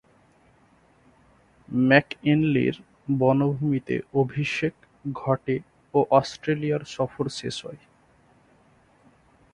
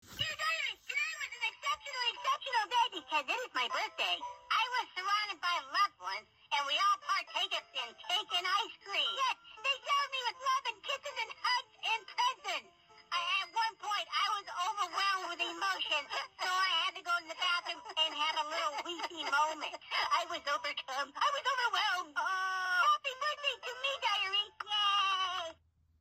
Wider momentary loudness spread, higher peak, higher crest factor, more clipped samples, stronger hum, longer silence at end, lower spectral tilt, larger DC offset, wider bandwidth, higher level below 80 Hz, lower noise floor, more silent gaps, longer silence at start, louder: first, 12 LU vs 7 LU; first, -2 dBFS vs -18 dBFS; first, 24 dB vs 16 dB; neither; neither; first, 1.75 s vs 0.5 s; first, -7 dB/octave vs 0.5 dB/octave; neither; second, 10.5 kHz vs 16 kHz; first, -60 dBFS vs -78 dBFS; about the same, -59 dBFS vs -61 dBFS; neither; first, 1.7 s vs 0.05 s; first, -24 LUFS vs -34 LUFS